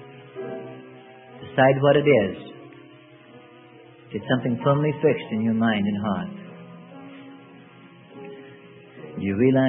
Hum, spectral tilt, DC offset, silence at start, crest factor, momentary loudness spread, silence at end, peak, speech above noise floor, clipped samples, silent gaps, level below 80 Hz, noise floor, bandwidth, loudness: none; -11.5 dB/octave; under 0.1%; 0 s; 20 dB; 25 LU; 0 s; -4 dBFS; 28 dB; under 0.1%; none; -64 dBFS; -48 dBFS; 4 kHz; -22 LUFS